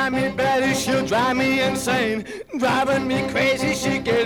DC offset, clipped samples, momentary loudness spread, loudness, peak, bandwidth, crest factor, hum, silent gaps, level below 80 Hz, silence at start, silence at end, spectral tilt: under 0.1%; under 0.1%; 3 LU; -20 LUFS; -8 dBFS; 19.5 kHz; 14 dB; none; none; -48 dBFS; 0 s; 0 s; -4 dB/octave